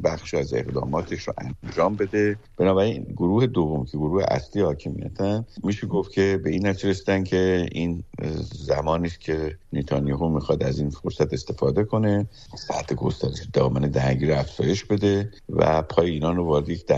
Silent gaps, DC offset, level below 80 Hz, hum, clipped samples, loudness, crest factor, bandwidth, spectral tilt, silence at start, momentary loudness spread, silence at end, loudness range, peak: none; under 0.1%; -42 dBFS; none; under 0.1%; -24 LUFS; 20 dB; 8 kHz; -7 dB/octave; 0 s; 8 LU; 0 s; 3 LU; -4 dBFS